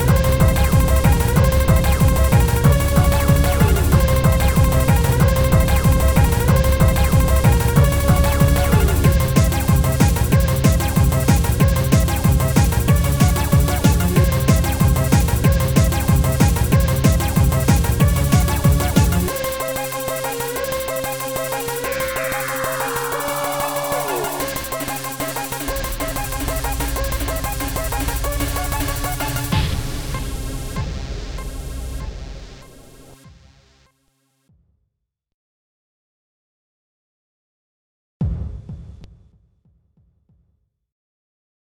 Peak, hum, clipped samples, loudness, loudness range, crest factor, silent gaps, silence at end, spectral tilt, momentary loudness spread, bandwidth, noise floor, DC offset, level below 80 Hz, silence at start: -2 dBFS; none; under 0.1%; -18 LUFS; 18 LU; 16 dB; 35.34-38.20 s; 2.7 s; -5.5 dB/octave; 10 LU; 19.5 kHz; -77 dBFS; 0.6%; -22 dBFS; 0 s